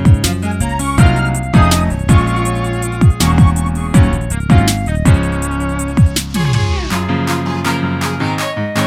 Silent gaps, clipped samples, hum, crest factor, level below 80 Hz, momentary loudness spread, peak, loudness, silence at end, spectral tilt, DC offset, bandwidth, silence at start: none; under 0.1%; none; 12 dB; -22 dBFS; 6 LU; 0 dBFS; -14 LUFS; 0 s; -5.5 dB/octave; under 0.1%; 16.5 kHz; 0 s